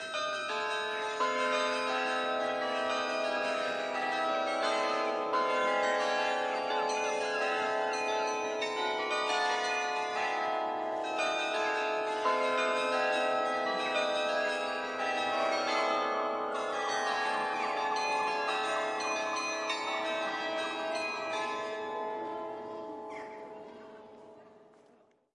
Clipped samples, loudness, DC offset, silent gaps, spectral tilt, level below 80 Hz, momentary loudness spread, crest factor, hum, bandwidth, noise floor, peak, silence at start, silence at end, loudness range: under 0.1%; -32 LUFS; under 0.1%; none; -1.5 dB/octave; -80 dBFS; 7 LU; 16 dB; none; 11 kHz; -65 dBFS; -18 dBFS; 0 s; 0.7 s; 5 LU